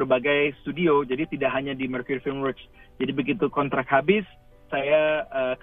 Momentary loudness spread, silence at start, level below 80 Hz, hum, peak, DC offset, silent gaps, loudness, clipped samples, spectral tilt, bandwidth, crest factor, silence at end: 9 LU; 0 s; -54 dBFS; none; -6 dBFS; under 0.1%; none; -24 LUFS; under 0.1%; -9 dB/octave; 3.9 kHz; 18 dB; 0.05 s